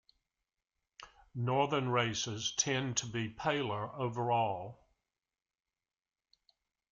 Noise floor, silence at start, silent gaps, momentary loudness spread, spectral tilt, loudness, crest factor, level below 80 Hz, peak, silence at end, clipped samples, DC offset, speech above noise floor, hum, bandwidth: under -90 dBFS; 1 s; none; 9 LU; -3.5 dB/octave; -34 LUFS; 20 dB; -70 dBFS; -16 dBFS; 2.15 s; under 0.1%; under 0.1%; over 56 dB; none; 8 kHz